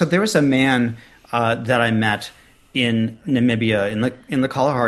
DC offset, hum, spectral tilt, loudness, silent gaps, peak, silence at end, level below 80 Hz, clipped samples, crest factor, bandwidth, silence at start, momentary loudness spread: under 0.1%; none; -5.5 dB/octave; -19 LUFS; none; -2 dBFS; 0 s; -54 dBFS; under 0.1%; 18 dB; 12.5 kHz; 0 s; 9 LU